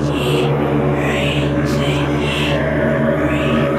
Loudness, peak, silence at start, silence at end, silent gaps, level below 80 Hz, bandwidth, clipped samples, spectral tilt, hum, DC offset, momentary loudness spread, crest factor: -16 LUFS; -4 dBFS; 0 s; 0 s; none; -32 dBFS; 14 kHz; under 0.1%; -6.5 dB/octave; none; under 0.1%; 1 LU; 12 dB